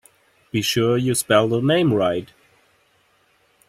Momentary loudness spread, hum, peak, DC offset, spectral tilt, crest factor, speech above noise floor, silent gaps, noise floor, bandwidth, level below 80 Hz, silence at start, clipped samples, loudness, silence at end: 7 LU; none; -4 dBFS; under 0.1%; -5 dB/octave; 18 dB; 42 dB; none; -61 dBFS; 16 kHz; -58 dBFS; 0.55 s; under 0.1%; -19 LUFS; 1.45 s